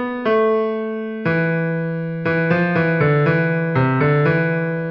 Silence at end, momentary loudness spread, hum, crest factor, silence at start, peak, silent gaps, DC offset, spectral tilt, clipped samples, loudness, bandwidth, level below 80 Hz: 0 s; 7 LU; none; 14 dB; 0 s; -4 dBFS; none; under 0.1%; -10 dB/octave; under 0.1%; -18 LUFS; 5.6 kHz; -54 dBFS